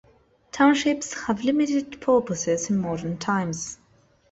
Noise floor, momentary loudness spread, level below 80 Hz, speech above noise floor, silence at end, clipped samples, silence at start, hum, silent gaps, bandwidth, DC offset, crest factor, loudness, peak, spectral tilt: -60 dBFS; 12 LU; -58 dBFS; 37 dB; 0.55 s; under 0.1%; 0.55 s; none; none; 8.2 kHz; under 0.1%; 16 dB; -24 LUFS; -8 dBFS; -4.5 dB/octave